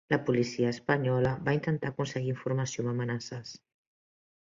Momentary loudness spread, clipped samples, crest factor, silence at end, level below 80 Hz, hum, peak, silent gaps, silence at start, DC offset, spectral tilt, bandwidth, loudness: 8 LU; under 0.1%; 20 dB; 0.85 s; -60 dBFS; none; -12 dBFS; none; 0.1 s; under 0.1%; -6.5 dB/octave; 7.6 kHz; -31 LUFS